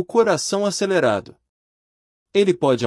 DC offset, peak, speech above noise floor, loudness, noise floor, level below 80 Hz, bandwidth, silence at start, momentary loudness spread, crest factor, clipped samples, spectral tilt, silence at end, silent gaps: under 0.1%; -4 dBFS; over 71 dB; -20 LUFS; under -90 dBFS; -66 dBFS; 12 kHz; 0 s; 4 LU; 16 dB; under 0.1%; -4.5 dB/octave; 0 s; 1.49-2.26 s